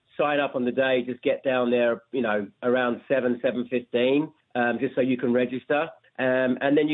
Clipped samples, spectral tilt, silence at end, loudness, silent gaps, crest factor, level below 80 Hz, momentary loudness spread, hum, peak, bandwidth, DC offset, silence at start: under 0.1%; -9.5 dB/octave; 0 s; -25 LUFS; none; 14 dB; -74 dBFS; 4 LU; none; -10 dBFS; 4.1 kHz; under 0.1%; 0.2 s